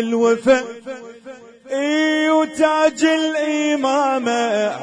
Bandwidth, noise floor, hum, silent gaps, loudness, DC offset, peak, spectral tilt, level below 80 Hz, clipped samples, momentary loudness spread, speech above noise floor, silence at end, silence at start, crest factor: 10.5 kHz; -39 dBFS; none; none; -17 LUFS; under 0.1%; -4 dBFS; -3.5 dB/octave; -62 dBFS; under 0.1%; 15 LU; 22 dB; 0 s; 0 s; 14 dB